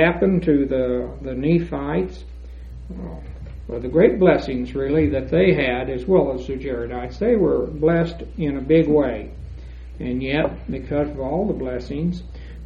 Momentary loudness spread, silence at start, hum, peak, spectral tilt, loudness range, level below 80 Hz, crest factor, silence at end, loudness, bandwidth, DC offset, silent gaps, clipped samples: 19 LU; 0 s; none; -2 dBFS; -9 dB/octave; 6 LU; -36 dBFS; 20 dB; 0 s; -21 LUFS; 7.2 kHz; under 0.1%; none; under 0.1%